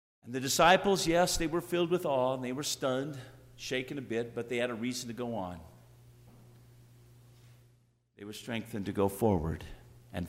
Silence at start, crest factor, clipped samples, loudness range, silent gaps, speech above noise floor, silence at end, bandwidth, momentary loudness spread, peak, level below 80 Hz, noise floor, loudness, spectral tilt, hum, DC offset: 0.25 s; 22 dB; under 0.1%; 16 LU; none; 36 dB; 0 s; 16 kHz; 18 LU; -12 dBFS; -54 dBFS; -68 dBFS; -31 LUFS; -4 dB/octave; 60 Hz at -55 dBFS; under 0.1%